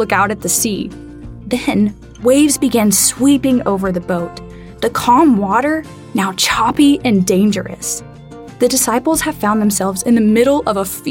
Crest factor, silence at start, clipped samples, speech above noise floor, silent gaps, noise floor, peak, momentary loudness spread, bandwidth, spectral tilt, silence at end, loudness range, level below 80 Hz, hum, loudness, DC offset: 14 dB; 0 s; under 0.1%; 20 dB; none; -34 dBFS; 0 dBFS; 12 LU; 17 kHz; -4 dB/octave; 0 s; 2 LU; -40 dBFS; none; -14 LUFS; under 0.1%